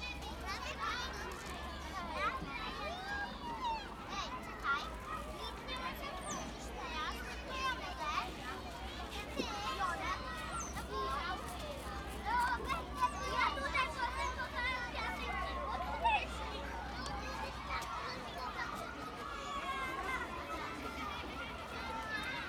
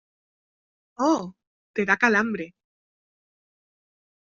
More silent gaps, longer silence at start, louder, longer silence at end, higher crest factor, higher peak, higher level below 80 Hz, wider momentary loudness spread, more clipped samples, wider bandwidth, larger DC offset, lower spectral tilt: second, none vs 1.47-1.74 s; second, 0 s vs 1 s; second, -40 LUFS vs -23 LUFS; second, 0 s vs 1.7 s; about the same, 20 dB vs 24 dB; second, -20 dBFS vs -4 dBFS; first, -50 dBFS vs -72 dBFS; second, 8 LU vs 17 LU; neither; first, 19.5 kHz vs 7.4 kHz; neither; about the same, -3.5 dB/octave vs -3.5 dB/octave